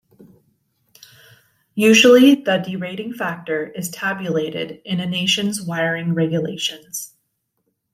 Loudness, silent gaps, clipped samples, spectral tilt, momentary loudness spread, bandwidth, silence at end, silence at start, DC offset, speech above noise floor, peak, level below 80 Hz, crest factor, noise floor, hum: -18 LUFS; none; under 0.1%; -4 dB/octave; 17 LU; 16 kHz; 0.9 s; 1.75 s; under 0.1%; 54 dB; -2 dBFS; -66 dBFS; 18 dB; -72 dBFS; none